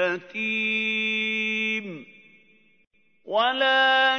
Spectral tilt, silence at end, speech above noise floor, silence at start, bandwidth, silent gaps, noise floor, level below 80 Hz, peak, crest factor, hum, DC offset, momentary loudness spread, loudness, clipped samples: -3.5 dB/octave; 0 s; 37 dB; 0 s; 6.6 kHz; none; -60 dBFS; -80 dBFS; -8 dBFS; 16 dB; none; under 0.1%; 10 LU; -23 LUFS; under 0.1%